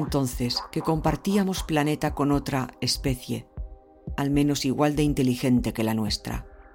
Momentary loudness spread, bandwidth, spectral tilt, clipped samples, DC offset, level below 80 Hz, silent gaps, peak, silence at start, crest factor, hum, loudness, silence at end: 12 LU; 17 kHz; -5.5 dB/octave; under 0.1%; under 0.1%; -40 dBFS; none; -10 dBFS; 0 s; 16 dB; none; -25 LUFS; 0.1 s